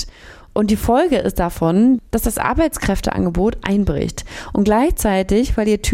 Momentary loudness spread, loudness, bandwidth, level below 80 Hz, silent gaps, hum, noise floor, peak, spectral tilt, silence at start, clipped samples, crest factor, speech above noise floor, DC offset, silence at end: 7 LU; -17 LUFS; 16.5 kHz; -28 dBFS; none; none; -39 dBFS; -4 dBFS; -5.5 dB/octave; 0 s; under 0.1%; 14 dB; 23 dB; under 0.1%; 0 s